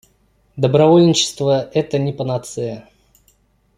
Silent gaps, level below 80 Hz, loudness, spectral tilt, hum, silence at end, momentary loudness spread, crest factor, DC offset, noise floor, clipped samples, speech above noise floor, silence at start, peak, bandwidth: none; -54 dBFS; -16 LUFS; -5.5 dB/octave; none; 0.95 s; 15 LU; 16 dB; under 0.1%; -58 dBFS; under 0.1%; 43 dB; 0.55 s; -2 dBFS; 15 kHz